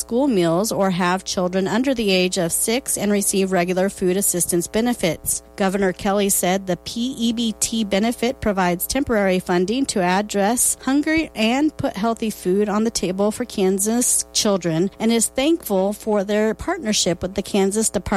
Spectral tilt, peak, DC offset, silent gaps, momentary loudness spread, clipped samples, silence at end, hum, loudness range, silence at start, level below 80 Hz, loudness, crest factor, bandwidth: -4 dB/octave; -6 dBFS; under 0.1%; none; 4 LU; under 0.1%; 0 s; none; 2 LU; 0 s; -46 dBFS; -20 LUFS; 14 dB; 16 kHz